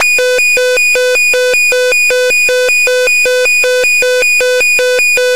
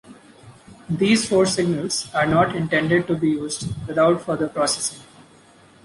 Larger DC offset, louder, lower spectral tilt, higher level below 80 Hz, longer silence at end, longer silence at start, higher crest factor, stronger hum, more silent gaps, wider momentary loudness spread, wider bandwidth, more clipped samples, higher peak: first, 3% vs under 0.1%; first, -8 LUFS vs -21 LUFS; second, 1.5 dB/octave vs -4.5 dB/octave; about the same, -48 dBFS vs -52 dBFS; second, 0 s vs 0.8 s; about the same, 0 s vs 0.05 s; second, 6 dB vs 18 dB; neither; neither; second, 0 LU vs 8 LU; first, 16 kHz vs 11.5 kHz; neither; about the same, -2 dBFS vs -4 dBFS